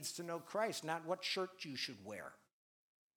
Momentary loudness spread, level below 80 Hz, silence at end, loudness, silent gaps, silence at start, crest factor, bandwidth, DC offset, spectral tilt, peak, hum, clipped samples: 11 LU; under -90 dBFS; 0.8 s; -42 LUFS; none; 0 s; 20 dB; over 20 kHz; under 0.1%; -3 dB/octave; -24 dBFS; none; under 0.1%